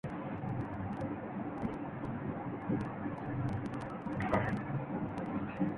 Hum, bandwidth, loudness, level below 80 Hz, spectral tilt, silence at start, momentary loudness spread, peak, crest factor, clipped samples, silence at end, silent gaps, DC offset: none; 11 kHz; -38 LUFS; -56 dBFS; -9 dB/octave; 0.05 s; 7 LU; -18 dBFS; 20 dB; under 0.1%; 0 s; none; under 0.1%